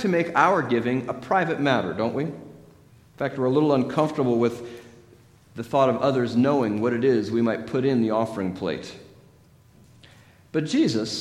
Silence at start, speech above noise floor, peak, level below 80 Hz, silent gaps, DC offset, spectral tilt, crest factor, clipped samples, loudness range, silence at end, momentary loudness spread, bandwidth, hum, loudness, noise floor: 0 s; 32 dB; -4 dBFS; -62 dBFS; none; under 0.1%; -6.5 dB/octave; 20 dB; under 0.1%; 5 LU; 0 s; 11 LU; 12.5 kHz; none; -23 LUFS; -54 dBFS